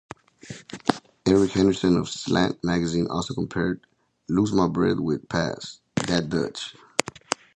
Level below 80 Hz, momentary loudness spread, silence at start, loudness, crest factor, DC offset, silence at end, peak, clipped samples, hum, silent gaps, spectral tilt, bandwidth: -50 dBFS; 14 LU; 0.45 s; -25 LUFS; 24 dB; under 0.1%; 0.2 s; 0 dBFS; under 0.1%; none; none; -5.5 dB/octave; 11 kHz